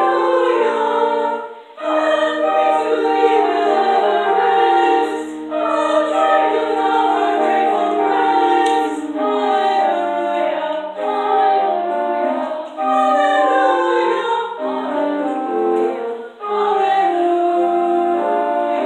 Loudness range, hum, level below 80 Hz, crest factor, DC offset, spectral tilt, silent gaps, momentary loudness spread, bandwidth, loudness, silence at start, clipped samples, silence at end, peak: 3 LU; none; -68 dBFS; 14 dB; under 0.1%; -4 dB/octave; none; 7 LU; 10 kHz; -17 LUFS; 0 s; under 0.1%; 0 s; -2 dBFS